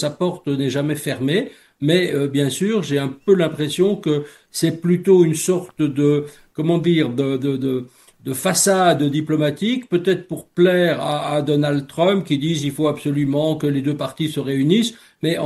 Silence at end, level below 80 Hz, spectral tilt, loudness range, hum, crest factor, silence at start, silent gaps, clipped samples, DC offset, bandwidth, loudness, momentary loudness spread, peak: 0 s; -60 dBFS; -5.5 dB/octave; 2 LU; none; 16 dB; 0 s; none; under 0.1%; under 0.1%; 12.5 kHz; -19 LUFS; 8 LU; -2 dBFS